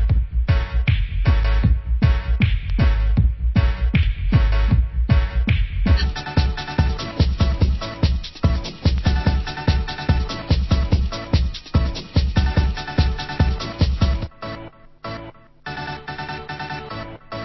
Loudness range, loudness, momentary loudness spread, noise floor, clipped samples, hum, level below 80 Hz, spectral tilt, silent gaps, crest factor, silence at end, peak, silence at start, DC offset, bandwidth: 5 LU; -21 LUFS; 11 LU; -39 dBFS; under 0.1%; none; -20 dBFS; -7 dB/octave; none; 14 dB; 0 s; -4 dBFS; 0 s; under 0.1%; 6 kHz